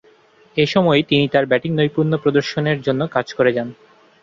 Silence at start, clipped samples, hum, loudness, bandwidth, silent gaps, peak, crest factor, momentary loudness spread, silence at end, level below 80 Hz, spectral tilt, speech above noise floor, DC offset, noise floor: 0.55 s; under 0.1%; none; -18 LUFS; 7.6 kHz; none; -2 dBFS; 16 dB; 6 LU; 0.5 s; -56 dBFS; -6.5 dB/octave; 34 dB; under 0.1%; -52 dBFS